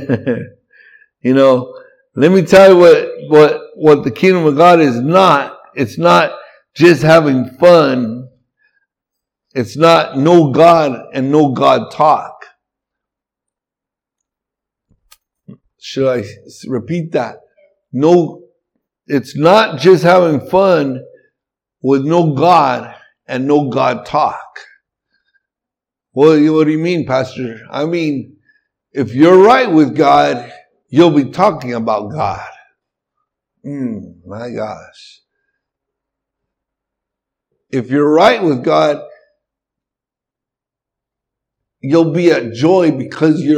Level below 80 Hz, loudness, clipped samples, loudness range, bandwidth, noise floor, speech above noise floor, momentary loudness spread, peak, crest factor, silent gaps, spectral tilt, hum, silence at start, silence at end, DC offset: -54 dBFS; -11 LUFS; 0.3%; 14 LU; 15 kHz; -85 dBFS; 74 dB; 16 LU; 0 dBFS; 14 dB; none; -6.5 dB/octave; none; 0 s; 0 s; under 0.1%